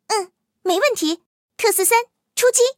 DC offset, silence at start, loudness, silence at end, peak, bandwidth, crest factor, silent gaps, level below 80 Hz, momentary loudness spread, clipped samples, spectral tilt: under 0.1%; 0.1 s; -19 LUFS; 0.05 s; -2 dBFS; 17 kHz; 18 dB; 1.26-1.48 s; -76 dBFS; 12 LU; under 0.1%; 0.5 dB/octave